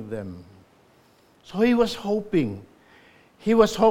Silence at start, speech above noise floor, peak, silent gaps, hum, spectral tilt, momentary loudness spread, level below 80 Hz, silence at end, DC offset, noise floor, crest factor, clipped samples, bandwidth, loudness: 0 s; 36 dB; -2 dBFS; none; none; -6 dB/octave; 19 LU; -52 dBFS; 0 s; under 0.1%; -58 dBFS; 22 dB; under 0.1%; 16.5 kHz; -23 LUFS